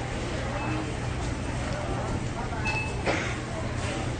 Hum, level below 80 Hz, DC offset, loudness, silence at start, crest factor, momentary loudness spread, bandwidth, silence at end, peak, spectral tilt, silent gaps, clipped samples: none; -38 dBFS; under 0.1%; -30 LUFS; 0 s; 16 dB; 4 LU; 10 kHz; 0 s; -14 dBFS; -5.5 dB/octave; none; under 0.1%